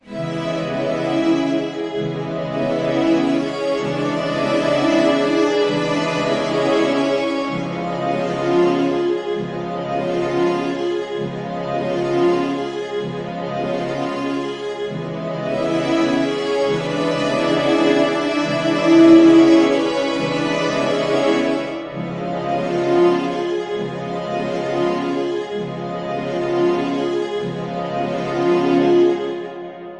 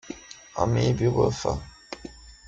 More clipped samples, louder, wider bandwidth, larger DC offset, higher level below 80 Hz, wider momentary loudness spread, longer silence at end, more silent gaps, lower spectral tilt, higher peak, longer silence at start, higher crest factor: neither; first, -19 LUFS vs -25 LUFS; first, 10.5 kHz vs 7.8 kHz; neither; second, -54 dBFS vs -44 dBFS; second, 9 LU vs 18 LU; second, 0 s vs 0.15 s; neither; about the same, -6 dB/octave vs -6.5 dB/octave; first, 0 dBFS vs -8 dBFS; about the same, 0.05 s vs 0.05 s; about the same, 18 dB vs 20 dB